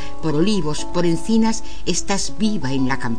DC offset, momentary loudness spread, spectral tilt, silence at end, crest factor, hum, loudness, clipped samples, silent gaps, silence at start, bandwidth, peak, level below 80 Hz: 10%; 5 LU; -4.5 dB/octave; 0 s; 14 dB; none; -21 LUFS; under 0.1%; none; 0 s; 10.5 kHz; -6 dBFS; -38 dBFS